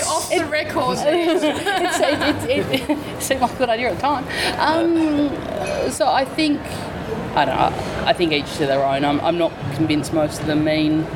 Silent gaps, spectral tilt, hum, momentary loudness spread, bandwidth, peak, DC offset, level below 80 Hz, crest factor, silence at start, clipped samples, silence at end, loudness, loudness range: none; -4.5 dB/octave; none; 5 LU; 18 kHz; -2 dBFS; under 0.1%; -44 dBFS; 16 dB; 0 s; under 0.1%; 0 s; -20 LUFS; 1 LU